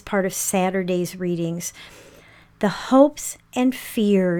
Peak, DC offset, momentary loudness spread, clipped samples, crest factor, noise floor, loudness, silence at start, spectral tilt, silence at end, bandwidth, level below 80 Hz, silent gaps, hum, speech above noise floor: -2 dBFS; under 0.1%; 13 LU; under 0.1%; 20 dB; -50 dBFS; -22 LUFS; 0.05 s; -5 dB/octave; 0 s; 19 kHz; -56 dBFS; none; none; 29 dB